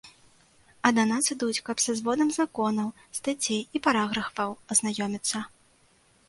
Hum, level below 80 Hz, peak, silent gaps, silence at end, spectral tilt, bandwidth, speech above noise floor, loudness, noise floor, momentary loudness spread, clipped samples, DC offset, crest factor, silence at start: none; -66 dBFS; -4 dBFS; none; 0.8 s; -2.5 dB/octave; 12 kHz; 35 dB; -27 LUFS; -63 dBFS; 8 LU; under 0.1%; under 0.1%; 24 dB; 0.05 s